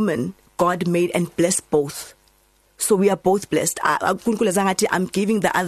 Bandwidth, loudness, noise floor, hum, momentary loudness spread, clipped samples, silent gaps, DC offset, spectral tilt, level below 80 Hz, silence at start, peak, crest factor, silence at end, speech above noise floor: 14 kHz; -20 LUFS; -59 dBFS; none; 7 LU; under 0.1%; none; under 0.1%; -4.5 dB/octave; -56 dBFS; 0 s; -6 dBFS; 14 dB; 0 s; 39 dB